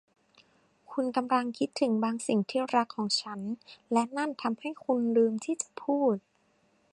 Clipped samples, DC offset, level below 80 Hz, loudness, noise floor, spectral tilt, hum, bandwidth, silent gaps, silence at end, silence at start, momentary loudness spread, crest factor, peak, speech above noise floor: under 0.1%; under 0.1%; -80 dBFS; -30 LUFS; -69 dBFS; -4.5 dB/octave; none; 11.5 kHz; none; 0.75 s; 0.9 s; 9 LU; 18 dB; -12 dBFS; 40 dB